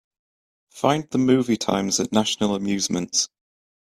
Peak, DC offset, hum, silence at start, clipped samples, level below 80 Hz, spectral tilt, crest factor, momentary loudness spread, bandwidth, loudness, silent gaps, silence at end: -4 dBFS; under 0.1%; none; 0.75 s; under 0.1%; -58 dBFS; -4 dB/octave; 20 dB; 4 LU; 14.5 kHz; -22 LUFS; none; 0.6 s